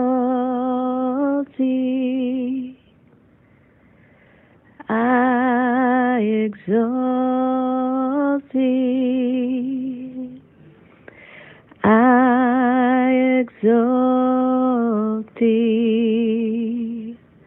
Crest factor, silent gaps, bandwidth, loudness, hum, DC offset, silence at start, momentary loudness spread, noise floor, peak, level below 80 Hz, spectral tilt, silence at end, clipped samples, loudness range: 16 dB; none; 3.6 kHz; -19 LUFS; none; under 0.1%; 0 s; 9 LU; -54 dBFS; -2 dBFS; -64 dBFS; -11 dB/octave; 0.3 s; under 0.1%; 8 LU